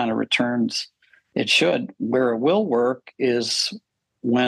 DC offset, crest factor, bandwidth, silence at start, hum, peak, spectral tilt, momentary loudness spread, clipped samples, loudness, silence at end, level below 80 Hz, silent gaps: under 0.1%; 16 dB; 12.5 kHz; 0 s; none; -6 dBFS; -4 dB/octave; 11 LU; under 0.1%; -22 LUFS; 0 s; -72 dBFS; none